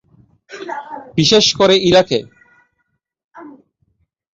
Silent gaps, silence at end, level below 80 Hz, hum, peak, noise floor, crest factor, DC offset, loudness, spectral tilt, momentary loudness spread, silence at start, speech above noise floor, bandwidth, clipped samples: 3.24-3.29 s; 0.85 s; -50 dBFS; none; -2 dBFS; -70 dBFS; 16 dB; under 0.1%; -12 LUFS; -4 dB/octave; 18 LU; 0.5 s; 56 dB; 8 kHz; under 0.1%